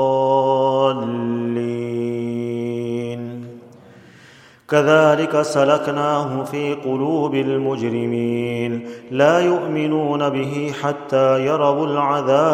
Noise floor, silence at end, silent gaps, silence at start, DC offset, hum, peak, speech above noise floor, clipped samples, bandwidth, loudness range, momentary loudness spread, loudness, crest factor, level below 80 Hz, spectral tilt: -47 dBFS; 0 s; none; 0 s; under 0.1%; none; 0 dBFS; 29 dB; under 0.1%; 13.5 kHz; 6 LU; 9 LU; -19 LUFS; 18 dB; -64 dBFS; -6.5 dB/octave